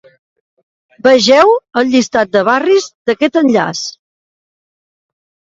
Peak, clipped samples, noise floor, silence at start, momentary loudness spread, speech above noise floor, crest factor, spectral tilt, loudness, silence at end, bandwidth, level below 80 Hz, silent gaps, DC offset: 0 dBFS; under 0.1%; under -90 dBFS; 1.05 s; 10 LU; over 79 dB; 14 dB; -3.5 dB/octave; -11 LUFS; 1.7 s; 7.8 kHz; -56 dBFS; 2.95-3.05 s; under 0.1%